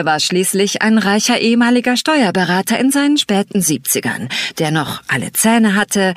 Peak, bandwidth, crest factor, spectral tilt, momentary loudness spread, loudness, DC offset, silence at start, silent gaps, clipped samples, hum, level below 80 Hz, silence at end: -2 dBFS; 15.5 kHz; 12 dB; -3.5 dB/octave; 6 LU; -14 LUFS; under 0.1%; 0 s; none; under 0.1%; none; -56 dBFS; 0 s